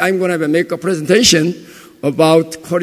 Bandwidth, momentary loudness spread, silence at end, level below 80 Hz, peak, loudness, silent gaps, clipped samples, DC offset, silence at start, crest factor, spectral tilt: 16 kHz; 11 LU; 0 s; -48 dBFS; 0 dBFS; -14 LUFS; none; under 0.1%; under 0.1%; 0 s; 14 dB; -4 dB/octave